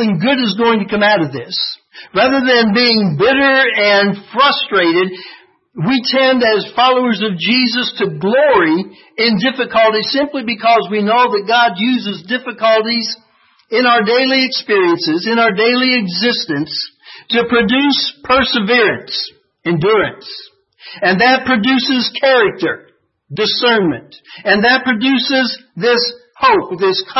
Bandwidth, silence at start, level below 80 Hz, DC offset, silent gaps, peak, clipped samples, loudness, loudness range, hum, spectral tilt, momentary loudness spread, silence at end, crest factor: 6 kHz; 0 s; -52 dBFS; under 0.1%; none; 0 dBFS; under 0.1%; -13 LUFS; 2 LU; none; -5.5 dB/octave; 10 LU; 0 s; 14 dB